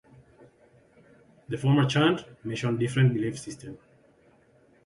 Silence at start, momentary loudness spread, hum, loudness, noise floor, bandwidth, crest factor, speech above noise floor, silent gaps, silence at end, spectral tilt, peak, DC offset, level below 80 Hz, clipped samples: 1.5 s; 17 LU; none; -26 LUFS; -61 dBFS; 11.5 kHz; 20 dB; 35 dB; none; 1.1 s; -6.5 dB/octave; -10 dBFS; under 0.1%; -62 dBFS; under 0.1%